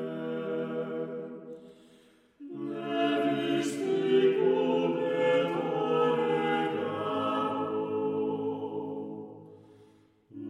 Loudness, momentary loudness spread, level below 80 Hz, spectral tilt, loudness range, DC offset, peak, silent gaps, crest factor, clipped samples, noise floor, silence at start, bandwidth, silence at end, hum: -29 LUFS; 15 LU; -82 dBFS; -6 dB/octave; 7 LU; under 0.1%; -14 dBFS; none; 16 dB; under 0.1%; -61 dBFS; 0 s; 12.5 kHz; 0 s; none